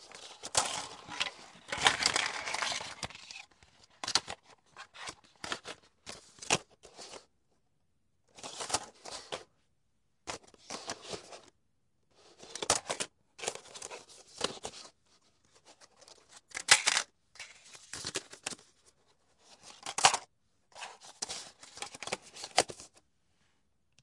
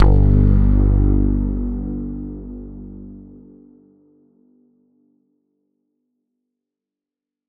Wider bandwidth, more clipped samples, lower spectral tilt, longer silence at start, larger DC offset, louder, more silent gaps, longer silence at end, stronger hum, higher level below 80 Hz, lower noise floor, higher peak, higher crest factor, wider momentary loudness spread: first, 11.5 kHz vs 2.4 kHz; neither; second, 0 dB/octave vs -12.5 dB/octave; about the same, 0 s vs 0 s; neither; second, -33 LUFS vs -18 LUFS; neither; second, 1.15 s vs 4.3 s; second, none vs 50 Hz at -60 dBFS; second, -70 dBFS vs -22 dBFS; second, -80 dBFS vs -88 dBFS; about the same, -6 dBFS vs -4 dBFS; first, 32 dB vs 16 dB; about the same, 22 LU vs 22 LU